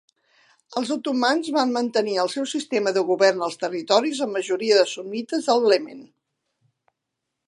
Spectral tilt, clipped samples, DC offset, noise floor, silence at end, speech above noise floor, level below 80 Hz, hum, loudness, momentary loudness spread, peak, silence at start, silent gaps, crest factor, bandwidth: -3 dB/octave; under 0.1%; under 0.1%; -81 dBFS; 1.45 s; 60 dB; -80 dBFS; none; -22 LUFS; 8 LU; -4 dBFS; 0.7 s; none; 20 dB; 11.5 kHz